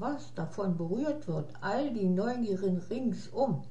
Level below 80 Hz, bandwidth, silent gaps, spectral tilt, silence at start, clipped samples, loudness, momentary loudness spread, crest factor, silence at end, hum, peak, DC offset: -68 dBFS; 8.4 kHz; none; -8 dB/octave; 0 s; under 0.1%; -33 LUFS; 6 LU; 14 dB; 0 s; none; -16 dBFS; 0.8%